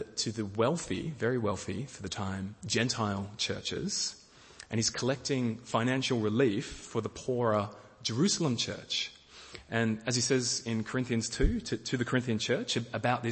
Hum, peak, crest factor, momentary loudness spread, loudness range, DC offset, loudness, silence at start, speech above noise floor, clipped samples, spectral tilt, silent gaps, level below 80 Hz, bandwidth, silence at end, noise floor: none; -12 dBFS; 20 dB; 9 LU; 2 LU; under 0.1%; -32 LUFS; 0 s; 22 dB; under 0.1%; -4 dB/octave; none; -48 dBFS; 8.8 kHz; 0 s; -53 dBFS